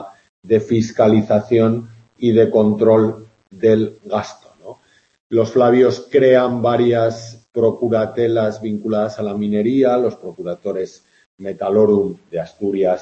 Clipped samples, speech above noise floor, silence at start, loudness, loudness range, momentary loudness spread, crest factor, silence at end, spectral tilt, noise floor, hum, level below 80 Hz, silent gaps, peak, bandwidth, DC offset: under 0.1%; 30 dB; 0 s; -17 LUFS; 4 LU; 13 LU; 16 dB; 0 s; -7.5 dB/octave; -46 dBFS; none; -58 dBFS; 0.29-0.43 s, 5.20-5.30 s, 11.26-11.38 s; -2 dBFS; 7.8 kHz; under 0.1%